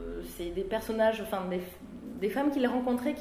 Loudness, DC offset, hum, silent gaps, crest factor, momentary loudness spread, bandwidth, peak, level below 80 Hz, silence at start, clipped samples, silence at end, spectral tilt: -31 LUFS; under 0.1%; none; none; 16 dB; 13 LU; 16.5 kHz; -14 dBFS; -52 dBFS; 0 s; under 0.1%; 0 s; -6 dB/octave